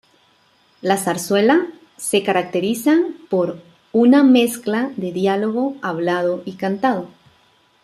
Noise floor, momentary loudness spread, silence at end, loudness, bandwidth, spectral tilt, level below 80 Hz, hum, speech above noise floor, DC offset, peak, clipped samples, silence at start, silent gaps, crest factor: -57 dBFS; 11 LU; 0.75 s; -18 LUFS; 14.5 kHz; -5 dB/octave; -66 dBFS; none; 40 dB; under 0.1%; -2 dBFS; under 0.1%; 0.85 s; none; 16 dB